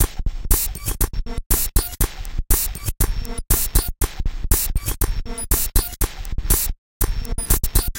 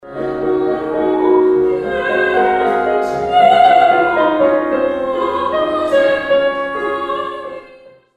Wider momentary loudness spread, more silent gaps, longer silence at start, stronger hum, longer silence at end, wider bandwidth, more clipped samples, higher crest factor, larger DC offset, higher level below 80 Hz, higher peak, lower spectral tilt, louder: about the same, 8 LU vs 10 LU; first, 1.46-1.50 s, 6.78-7.00 s vs none; about the same, 0 s vs 0.05 s; neither; second, 0 s vs 0.5 s; first, 17.5 kHz vs 10 kHz; neither; first, 20 dB vs 14 dB; neither; first, -22 dBFS vs -48 dBFS; about the same, -2 dBFS vs 0 dBFS; second, -3 dB/octave vs -6 dB/octave; second, -22 LUFS vs -14 LUFS